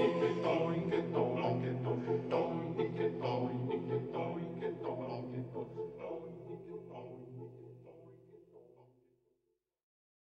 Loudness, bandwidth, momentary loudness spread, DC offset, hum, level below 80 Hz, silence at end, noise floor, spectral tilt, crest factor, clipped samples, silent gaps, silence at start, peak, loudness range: -37 LUFS; 8 kHz; 16 LU; under 0.1%; none; -72 dBFS; 1.5 s; -84 dBFS; -8.5 dB/octave; 18 dB; under 0.1%; none; 0 s; -20 dBFS; 18 LU